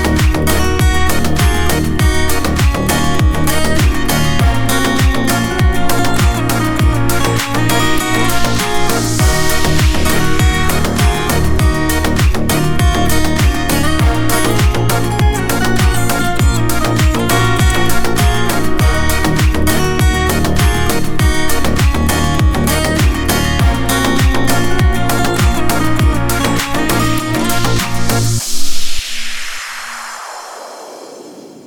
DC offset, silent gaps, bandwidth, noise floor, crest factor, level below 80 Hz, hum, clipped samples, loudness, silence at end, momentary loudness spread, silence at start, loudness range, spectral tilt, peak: under 0.1%; none; 19.5 kHz; -33 dBFS; 12 dB; -18 dBFS; none; under 0.1%; -14 LUFS; 0.05 s; 3 LU; 0 s; 1 LU; -4.5 dB/octave; 0 dBFS